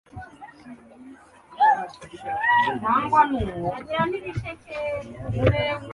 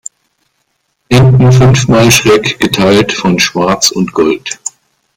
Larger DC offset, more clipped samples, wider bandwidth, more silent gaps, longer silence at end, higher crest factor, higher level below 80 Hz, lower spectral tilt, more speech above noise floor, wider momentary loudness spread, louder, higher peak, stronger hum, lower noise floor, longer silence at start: neither; neither; second, 11.5 kHz vs 16.5 kHz; neither; second, 0 s vs 0.5 s; first, 20 dB vs 10 dB; second, -44 dBFS vs -36 dBFS; first, -7 dB/octave vs -5 dB/octave; second, 23 dB vs 54 dB; first, 19 LU vs 11 LU; second, -23 LUFS vs -8 LUFS; second, -4 dBFS vs 0 dBFS; neither; second, -47 dBFS vs -62 dBFS; second, 0.15 s vs 1.1 s